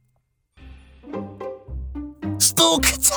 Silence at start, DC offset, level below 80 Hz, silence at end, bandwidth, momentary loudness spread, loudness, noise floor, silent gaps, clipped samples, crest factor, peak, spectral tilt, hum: 0.6 s; under 0.1%; -38 dBFS; 0 s; over 20 kHz; 20 LU; -17 LUFS; -68 dBFS; none; under 0.1%; 20 dB; -4 dBFS; -2 dB/octave; none